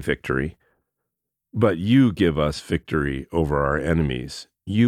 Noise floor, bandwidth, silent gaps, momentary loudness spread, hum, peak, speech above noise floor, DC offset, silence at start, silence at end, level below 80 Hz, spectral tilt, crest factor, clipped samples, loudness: -82 dBFS; 14 kHz; none; 13 LU; none; -4 dBFS; 61 dB; under 0.1%; 0 s; 0 s; -38 dBFS; -7 dB/octave; 18 dB; under 0.1%; -22 LUFS